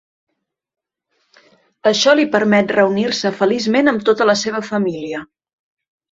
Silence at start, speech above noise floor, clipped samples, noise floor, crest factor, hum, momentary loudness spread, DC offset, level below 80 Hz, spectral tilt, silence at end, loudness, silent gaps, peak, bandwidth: 1.85 s; 53 dB; under 0.1%; -68 dBFS; 18 dB; none; 8 LU; under 0.1%; -60 dBFS; -4 dB/octave; 0.85 s; -15 LUFS; none; 0 dBFS; 7.8 kHz